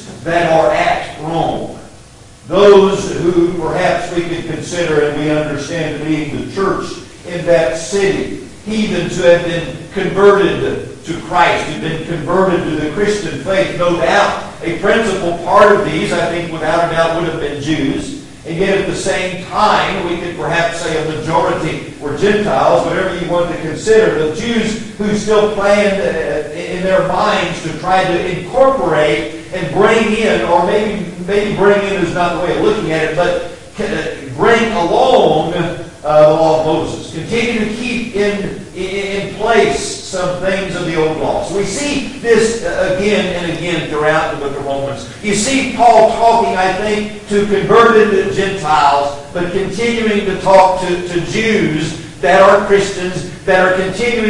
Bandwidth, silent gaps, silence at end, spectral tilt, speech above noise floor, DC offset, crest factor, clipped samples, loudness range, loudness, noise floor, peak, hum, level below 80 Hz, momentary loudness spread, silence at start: 11.5 kHz; none; 0 s; -5 dB/octave; 25 dB; under 0.1%; 14 dB; under 0.1%; 4 LU; -14 LUFS; -38 dBFS; 0 dBFS; none; -38 dBFS; 11 LU; 0 s